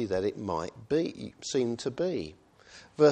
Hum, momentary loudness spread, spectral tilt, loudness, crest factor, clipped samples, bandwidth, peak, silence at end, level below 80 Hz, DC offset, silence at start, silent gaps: none; 12 LU; -5.5 dB/octave; -31 LUFS; 20 dB; under 0.1%; 9.6 kHz; -10 dBFS; 0 s; -62 dBFS; under 0.1%; 0 s; none